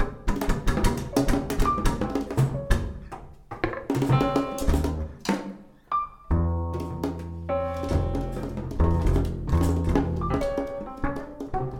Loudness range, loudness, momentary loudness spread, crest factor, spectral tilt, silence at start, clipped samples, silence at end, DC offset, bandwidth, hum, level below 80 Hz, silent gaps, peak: 3 LU; -27 LUFS; 9 LU; 20 dB; -7 dB/octave; 0 s; under 0.1%; 0 s; under 0.1%; 17.5 kHz; none; -30 dBFS; none; -6 dBFS